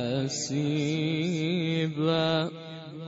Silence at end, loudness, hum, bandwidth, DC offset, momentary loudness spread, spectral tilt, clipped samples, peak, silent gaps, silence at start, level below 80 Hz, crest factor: 0 s; -28 LUFS; none; 8 kHz; under 0.1%; 6 LU; -5.5 dB/octave; under 0.1%; -14 dBFS; none; 0 s; -64 dBFS; 16 dB